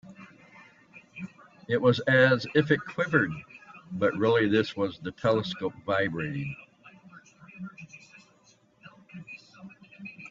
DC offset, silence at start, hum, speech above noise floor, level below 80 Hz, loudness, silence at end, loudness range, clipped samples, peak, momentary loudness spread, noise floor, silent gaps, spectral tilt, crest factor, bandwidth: under 0.1%; 0.05 s; none; 36 dB; -64 dBFS; -26 LUFS; 0 s; 21 LU; under 0.1%; -8 dBFS; 25 LU; -62 dBFS; none; -7 dB/octave; 22 dB; 7.6 kHz